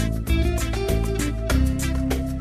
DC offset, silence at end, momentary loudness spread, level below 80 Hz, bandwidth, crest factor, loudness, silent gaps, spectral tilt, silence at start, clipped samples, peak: under 0.1%; 0 s; 3 LU; -24 dBFS; 15 kHz; 14 dB; -24 LUFS; none; -5.5 dB/octave; 0 s; under 0.1%; -8 dBFS